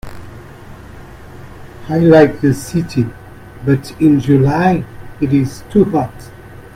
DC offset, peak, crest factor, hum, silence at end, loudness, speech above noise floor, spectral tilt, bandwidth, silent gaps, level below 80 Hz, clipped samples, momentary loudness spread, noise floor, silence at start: under 0.1%; 0 dBFS; 16 dB; none; 0.05 s; -14 LUFS; 22 dB; -8 dB/octave; 15.5 kHz; none; -40 dBFS; under 0.1%; 25 LU; -34 dBFS; 0.05 s